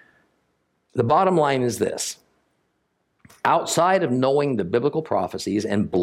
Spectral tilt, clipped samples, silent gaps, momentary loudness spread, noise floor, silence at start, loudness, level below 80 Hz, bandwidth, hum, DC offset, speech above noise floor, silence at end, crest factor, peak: -5 dB/octave; under 0.1%; none; 7 LU; -71 dBFS; 0.95 s; -22 LUFS; -64 dBFS; 16.5 kHz; none; under 0.1%; 51 dB; 0 s; 18 dB; -4 dBFS